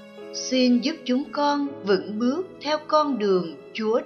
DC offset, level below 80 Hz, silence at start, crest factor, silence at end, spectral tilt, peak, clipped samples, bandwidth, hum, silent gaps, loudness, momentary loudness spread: under 0.1%; -72 dBFS; 0 s; 16 dB; 0 s; -4.5 dB/octave; -8 dBFS; under 0.1%; 6.8 kHz; none; none; -24 LUFS; 8 LU